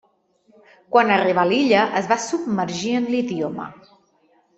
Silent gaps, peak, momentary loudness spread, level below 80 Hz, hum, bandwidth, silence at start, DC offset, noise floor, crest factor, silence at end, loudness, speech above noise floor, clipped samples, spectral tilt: none; -2 dBFS; 10 LU; -64 dBFS; none; 8.4 kHz; 0.9 s; under 0.1%; -61 dBFS; 20 dB; 0.85 s; -20 LUFS; 41 dB; under 0.1%; -4.5 dB/octave